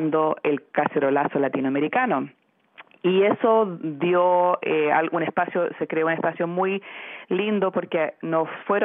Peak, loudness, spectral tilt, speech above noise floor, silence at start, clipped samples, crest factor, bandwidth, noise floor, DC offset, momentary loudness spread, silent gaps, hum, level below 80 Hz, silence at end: -6 dBFS; -23 LUFS; -4.5 dB/octave; 29 dB; 0 s; under 0.1%; 16 dB; 3.8 kHz; -51 dBFS; under 0.1%; 7 LU; none; none; under -90 dBFS; 0 s